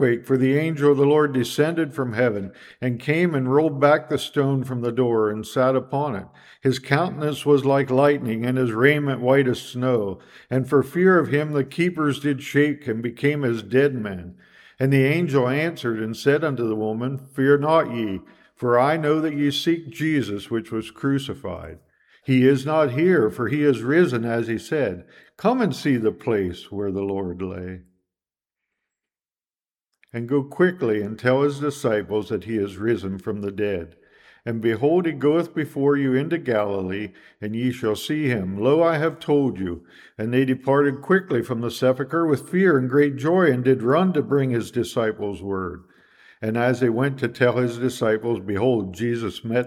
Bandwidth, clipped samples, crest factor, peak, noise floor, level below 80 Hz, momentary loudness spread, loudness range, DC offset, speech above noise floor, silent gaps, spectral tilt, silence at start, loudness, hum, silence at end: 15 kHz; under 0.1%; 20 dB; -2 dBFS; under -90 dBFS; -60 dBFS; 11 LU; 5 LU; under 0.1%; over 69 dB; none; -7 dB/octave; 0 s; -22 LUFS; none; 0 s